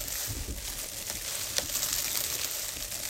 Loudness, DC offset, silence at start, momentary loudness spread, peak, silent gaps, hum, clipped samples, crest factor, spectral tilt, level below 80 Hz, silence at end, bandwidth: -31 LUFS; under 0.1%; 0 s; 7 LU; -4 dBFS; none; none; under 0.1%; 30 dB; -0.5 dB/octave; -46 dBFS; 0 s; 17 kHz